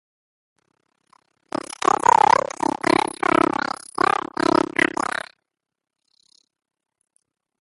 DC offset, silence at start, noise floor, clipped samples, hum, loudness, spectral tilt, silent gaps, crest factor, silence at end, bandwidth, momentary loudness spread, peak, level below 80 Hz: under 0.1%; 1.8 s; -81 dBFS; under 0.1%; none; -20 LUFS; -3.5 dB/octave; none; 22 dB; 2.75 s; 11.5 kHz; 15 LU; -2 dBFS; -58 dBFS